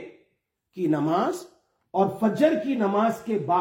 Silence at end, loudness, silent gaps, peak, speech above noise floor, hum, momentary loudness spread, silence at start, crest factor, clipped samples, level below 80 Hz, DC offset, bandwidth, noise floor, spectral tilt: 0 s; -24 LUFS; none; -8 dBFS; 50 dB; none; 9 LU; 0 s; 18 dB; under 0.1%; -70 dBFS; under 0.1%; 16.5 kHz; -74 dBFS; -7 dB/octave